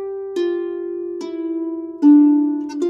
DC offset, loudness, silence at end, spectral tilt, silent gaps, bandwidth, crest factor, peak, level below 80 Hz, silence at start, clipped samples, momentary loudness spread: under 0.1%; -18 LUFS; 0 s; -5.5 dB/octave; none; 7.2 kHz; 14 dB; -4 dBFS; -68 dBFS; 0 s; under 0.1%; 15 LU